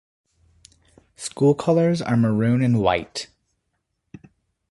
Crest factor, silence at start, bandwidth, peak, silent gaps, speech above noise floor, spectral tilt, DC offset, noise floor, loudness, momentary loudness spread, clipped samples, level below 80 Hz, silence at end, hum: 20 dB; 1.2 s; 11.5 kHz; -4 dBFS; none; 56 dB; -6.5 dB/octave; under 0.1%; -75 dBFS; -20 LUFS; 14 LU; under 0.1%; -52 dBFS; 1.45 s; none